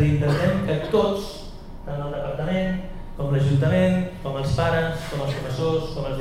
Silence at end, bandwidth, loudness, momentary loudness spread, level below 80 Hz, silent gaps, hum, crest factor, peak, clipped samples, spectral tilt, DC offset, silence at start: 0 s; 13 kHz; -24 LUFS; 12 LU; -38 dBFS; none; none; 16 dB; -8 dBFS; under 0.1%; -7.5 dB/octave; under 0.1%; 0 s